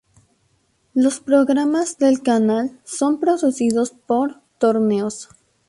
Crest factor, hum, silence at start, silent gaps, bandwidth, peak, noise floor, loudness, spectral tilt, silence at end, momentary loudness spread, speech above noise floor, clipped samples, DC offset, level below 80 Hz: 16 dB; none; 0.95 s; none; 11.5 kHz; -4 dBFS; -64 dBFS; -19 LUFS; -5 dB/octave; 0.45 s; 8 LU; 46 dB; under 0.1%; under 0.1%; -64 dBFS